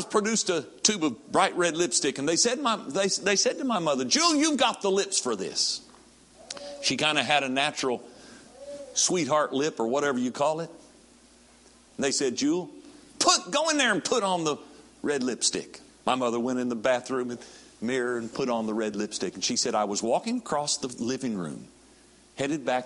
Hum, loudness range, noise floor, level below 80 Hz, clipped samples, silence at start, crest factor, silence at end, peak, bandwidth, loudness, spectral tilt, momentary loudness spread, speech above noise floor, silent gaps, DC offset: none; 5 LU; -56 dBFS; -68 dBFS; under 0.1%; 0 s; 22 dB; 0 s; -6 dBFS; 11.5 kHz; -26 LUFS; -2.5 dB/octave; 12 LU; 30 dB; none; under 0.1%